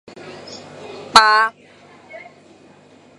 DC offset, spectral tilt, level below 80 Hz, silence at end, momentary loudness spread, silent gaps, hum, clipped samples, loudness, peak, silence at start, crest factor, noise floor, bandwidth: under 0.1%; -0.5 dB/octave; -56 dBFS; 1 s; 28 LU; none; 50 Hz at -55 dBFS; under 0.1%; -13 LUFS; 0 dBFS; 0.25 s; 20 dB; -48 dBFS; 13 kHz